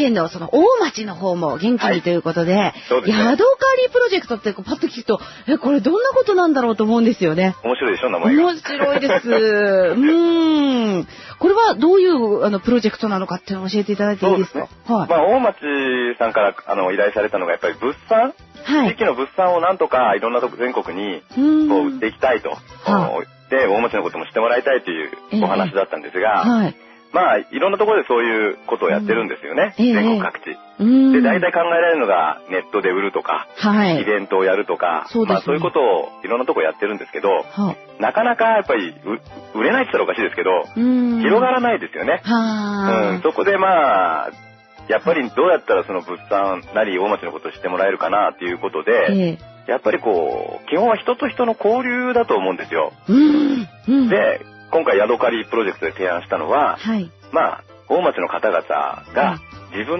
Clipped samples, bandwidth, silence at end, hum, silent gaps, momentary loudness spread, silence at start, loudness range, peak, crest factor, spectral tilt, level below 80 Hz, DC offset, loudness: under 0.1%; 6.2 kHz; 0 s; none; none; 9 LU; 0 s; 3 LU; -2 dBFS; 14 dB; -6.5 dB/octave; -56 dBFS; under 0.1%; -18 LUFS